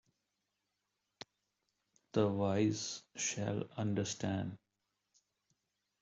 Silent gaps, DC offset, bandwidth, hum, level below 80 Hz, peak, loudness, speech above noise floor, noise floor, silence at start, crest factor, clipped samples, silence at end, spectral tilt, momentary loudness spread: none; under 0.1%; 8.2 kHz; none; -74 dBFS; -18 dBFS; -37 LUFS; 50 dB; -86 dBFS; 2.15 s; 22 dB; under 0.1%; 1.45 s; -5 dB/octave; 21 LU